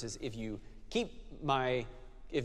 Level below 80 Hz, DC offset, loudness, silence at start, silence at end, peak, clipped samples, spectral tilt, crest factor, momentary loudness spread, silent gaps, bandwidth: -52 dBFS; under 0.1%; -37 LUFS; 0 s; 0 s; -16 dBFS; under 0.1%; -5 dB/octave; 20 dB; 16 LU; none; 12.5 kHz